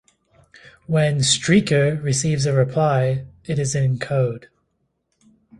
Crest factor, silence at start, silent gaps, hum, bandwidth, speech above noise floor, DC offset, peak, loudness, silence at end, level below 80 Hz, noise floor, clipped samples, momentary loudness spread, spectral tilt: 18 dB; 0.9 s; none; none; 11.5 kHz; 52 dB; under 0.1%; -2 dBFS; -20 LUFS; 1.15 s; -52 dBFS; -71 dBFS; under 0.1%; 8 LU; -5 dB/octave